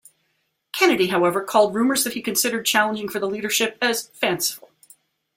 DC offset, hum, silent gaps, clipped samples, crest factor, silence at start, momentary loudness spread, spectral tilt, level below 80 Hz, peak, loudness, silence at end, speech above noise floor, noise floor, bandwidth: under 0.1%; none; none; under 0.1%; 20 dB; 0.75 s; 8 LU; -2.5 dB/octave; -66 dBFS; -2 dBFS; -20 LUFS; 0.8 s; 50 dB; -71 dBFS; 16.5 kHz